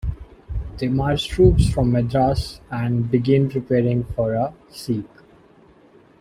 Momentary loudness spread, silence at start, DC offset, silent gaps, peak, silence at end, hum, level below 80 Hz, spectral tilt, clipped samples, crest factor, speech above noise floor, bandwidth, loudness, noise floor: 15 LU; 0.05 s; under 0.1%; none; -2 dBFS; 1.15 s; none; -32 dBFS; -7.5 dB/octave; under 0.1%; 18 dB; 32 dB; 13.5 kHz; -20 LUFS; -51 dBFS